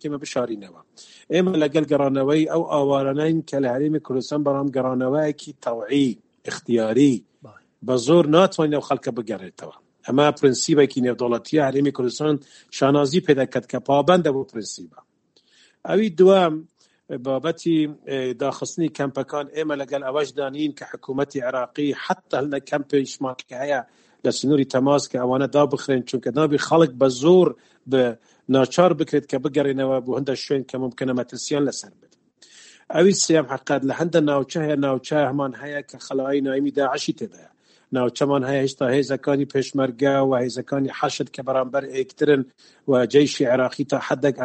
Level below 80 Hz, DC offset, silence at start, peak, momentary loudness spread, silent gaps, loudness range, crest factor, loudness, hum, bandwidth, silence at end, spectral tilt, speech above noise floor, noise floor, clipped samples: -66 dBFS; under 0.1%; 0.05 s; 0 dBFS; 11 LU; none; 6 LU; 20 dB; -21 LUFS; none; 8.8 kHz; 0 s; -5.5 dB/octave; 40 dB; -61 dBFS; under 0.1%